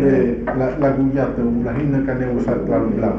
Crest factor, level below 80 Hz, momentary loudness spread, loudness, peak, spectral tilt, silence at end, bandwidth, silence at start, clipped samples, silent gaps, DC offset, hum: 12 dB; -34 dBFS; 3 LU; -19 LUFS; -6 dBFS; -10.5 dB/octave; 0 s; 6.2 kHz; 0 s; under 0.1%; none; under 0.1%; none